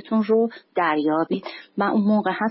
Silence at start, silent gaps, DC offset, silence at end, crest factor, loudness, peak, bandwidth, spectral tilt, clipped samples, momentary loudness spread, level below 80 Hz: 0.05 s; none; under 0.1%; 0 s; 12 dB; -22 LUFS; -8 dBFS; 5.8 kHz; -11 dB/octave; under 0.1%; 7 LU; -70 dBFS